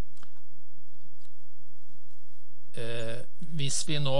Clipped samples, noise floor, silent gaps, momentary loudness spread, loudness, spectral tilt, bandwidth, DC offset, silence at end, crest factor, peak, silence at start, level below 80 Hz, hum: under 0.1%; -66 dBFS; none; 13 LU; -35 LUFS; -4 dB/octave; 11.5 kHz; 10%; 0 s; 22 dB; -12 dBFS; 2.75 s; -70 dBFS; none